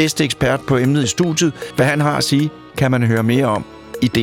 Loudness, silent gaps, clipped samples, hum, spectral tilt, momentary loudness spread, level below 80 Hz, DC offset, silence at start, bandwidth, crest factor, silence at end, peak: -17 LUFS; none; under 0.1%; none; -5 dB/octave; 5 LU; -46 dBFS; under 0.1%; 0 s; 17.5 kHz; 14 dB; 0 s; -2 dBFS